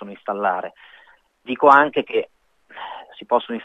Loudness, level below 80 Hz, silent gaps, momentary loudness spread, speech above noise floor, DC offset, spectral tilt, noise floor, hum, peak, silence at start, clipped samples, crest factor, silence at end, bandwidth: -19 LUFS; -70 dBFS; none; 23 LU; 35 dB; under 0.1%; -6 dB/octave; -54 dBFS; none; 0 dBFS; 0 s; under 0.1%; 22 dB; 0 s; 8.2 kHz